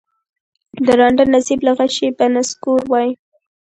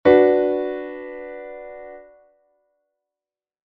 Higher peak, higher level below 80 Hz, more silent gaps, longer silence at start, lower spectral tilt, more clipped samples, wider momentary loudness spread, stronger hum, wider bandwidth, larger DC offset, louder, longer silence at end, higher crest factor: about the same, 0 dBFS vs -2 dBFS; about the same, -52 dBFS vs -56 dBFS; neither; first, 0.75 s vs 0.05 s; about the same, -3.5 dB/octave vs -4.5 dB/octave; neither; second, 7 LU vs 23 LU; neither; first, 10.5 kHz vs 4.9 kHz; neither; first, -15 LUFS vs -19 LUFS; second, 0.5 s vs 1.7 s; about the same, 16 dB vs 20 dB